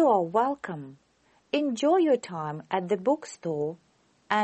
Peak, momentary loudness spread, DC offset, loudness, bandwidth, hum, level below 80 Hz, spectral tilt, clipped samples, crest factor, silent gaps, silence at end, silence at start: -8 dBFS; 13 LU; under 0.1%; -27 LUFS; 8.4 kHz; none; -74 dBFS; -5.5 dB/octave; under 0.1%; 18 dB; none; 0 s; 0 s